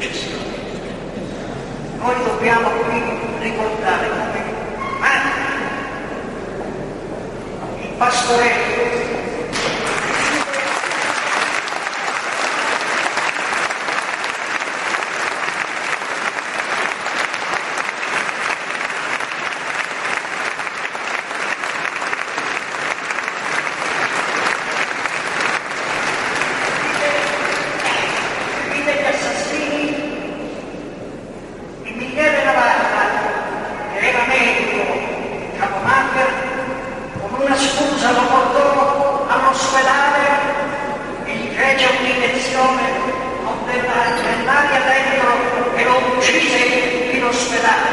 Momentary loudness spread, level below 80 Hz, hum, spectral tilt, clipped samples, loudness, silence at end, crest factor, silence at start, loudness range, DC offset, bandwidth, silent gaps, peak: 13 LU; -46 dBFS; none; -3 dB/octave; under 0.1%; -18 LUFS; 0 s; 18 dB; 0 s; 6 LU; under 0.1%; 11.5 kHz; none; -2 dBFS